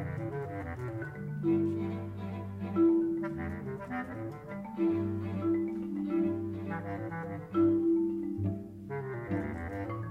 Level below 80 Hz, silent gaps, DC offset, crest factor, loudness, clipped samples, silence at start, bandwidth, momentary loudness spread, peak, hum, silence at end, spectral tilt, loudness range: -58 dBFS; none; under 0.1%; 14 dB; -34 LUFS; under 0.1%; 0 s; 4.2 kHz; 12 LU; -18 dBFS; none; 0 s; -10 dB/octave; 2 LU